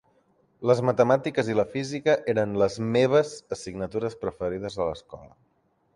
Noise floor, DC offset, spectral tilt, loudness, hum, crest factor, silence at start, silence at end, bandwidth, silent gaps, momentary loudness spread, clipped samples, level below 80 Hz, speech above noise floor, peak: -69 dBFS; under 0.1%; -6 dB/octave; -25 LUFS; none; 20 dB; 0.6 s; 0.7 s; 11 kHz; none; 12 LU; under 0.1%; -56 dBFS; 44 dB; -6 dBFS